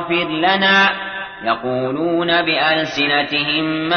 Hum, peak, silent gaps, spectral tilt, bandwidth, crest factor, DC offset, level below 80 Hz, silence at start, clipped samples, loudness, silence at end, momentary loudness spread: none; -4 dBFS; none; -5 dB/octave; 6.6 kHz; 14 dB; under 0.1%; -54 dBFS; 0 s; under 0.1%; -16 LUFS; 0 s; 9 LU